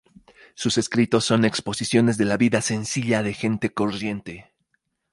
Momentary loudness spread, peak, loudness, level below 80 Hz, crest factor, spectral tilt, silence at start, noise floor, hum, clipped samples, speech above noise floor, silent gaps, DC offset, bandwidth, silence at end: 9 LU; -6 dBFS; -22 LUFS; -56 dBFS; 18 dB; -4.5 dB/octave; 0.6 s; -73 dBFS; none; under 0.1%; 51 dB; none; under 0.1%; 11.5 kHz; 0.7 s